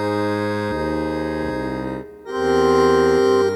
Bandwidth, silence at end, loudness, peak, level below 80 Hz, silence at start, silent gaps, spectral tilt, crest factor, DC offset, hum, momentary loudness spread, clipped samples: 13.5 kHz; 0 s; -20 LUFS; -4 dBFS; -42 dBFS; 0 s; none; -6 dB/octave; 16 dB; under 0.1%; none; 12 LU; under 0.1%